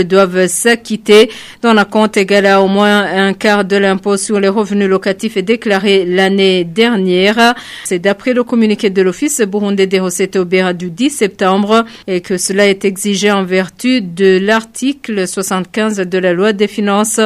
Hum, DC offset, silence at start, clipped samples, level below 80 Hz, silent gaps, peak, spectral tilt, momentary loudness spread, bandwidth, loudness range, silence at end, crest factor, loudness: none; under 0.1%; 0 s; under 0.1%; -54 dBFS; none; 0 dBFS; -4 dB/octave; 7 LU; 15 kHz; 3 LU; 0 s; 12 dB; -12 LUFS